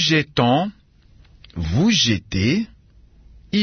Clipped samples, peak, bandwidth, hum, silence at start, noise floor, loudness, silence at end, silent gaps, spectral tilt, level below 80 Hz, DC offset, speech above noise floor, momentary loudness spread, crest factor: under 0.1%; -2 dBFS; 6.6 kHz; none; 0 s; -51 dBFS; -19 LUFS; 0 s; none; -4.5 dB/octave; -44 dBFS; under 0.1%; 32 dB; 14 LU; 18 dB